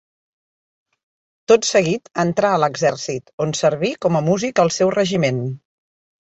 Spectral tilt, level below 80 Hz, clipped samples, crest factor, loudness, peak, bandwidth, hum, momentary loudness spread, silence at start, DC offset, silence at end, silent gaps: -5 dB/octave; -58 dBFS; under 0.1%; 18 dB; -18 LUFS; -2 dBFS; 8.2 kHz; none; 10 LU; 1.5 s; under 0.1%; 0.65 s; 3.33-3.38 s